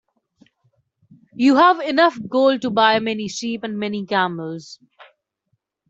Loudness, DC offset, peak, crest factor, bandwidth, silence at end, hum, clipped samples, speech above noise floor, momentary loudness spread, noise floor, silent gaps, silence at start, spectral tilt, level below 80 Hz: -18 LUFS; under 0.1%; -2 dBFS; 18 dB; 8 kHz; 0.85 s; none; under 0.1%; 54 dB; 12 LU; -72 dBFS; none; 1.35 s; -4.5 dB/octave; -66 dBFS